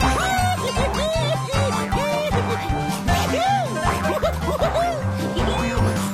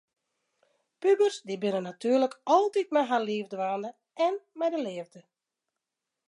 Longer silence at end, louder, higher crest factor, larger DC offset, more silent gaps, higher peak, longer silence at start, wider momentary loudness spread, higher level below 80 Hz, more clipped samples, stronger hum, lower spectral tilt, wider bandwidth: second, 0 s vs 1.1 s; first, -21 LUFS vs -28 LUFS; about the same, 14 dB vs 18 dB; neither; neither; first, -6 dBFS vs -10 dBFS; second, 0 s vs 1 s; second, 3 LU vs 11 LU; first, -32 dBFS vs -86 dBFS; neither; neither; about the same, -5 dB/octave vs -5 dB/octave; first, 14.5 kHz vs 11 kHz